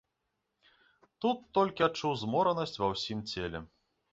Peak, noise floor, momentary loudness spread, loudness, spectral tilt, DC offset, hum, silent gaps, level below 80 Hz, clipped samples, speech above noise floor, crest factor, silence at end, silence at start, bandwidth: -14 dBFS; -83 dBFS; 8 LU; -32 LUFS; -5.5 dB/octave; under 0.1%; none; none; -60 dBFS; under 0.1%; 52 dB; 20 dB; 0.45 s; 1.2 s; 8 kHz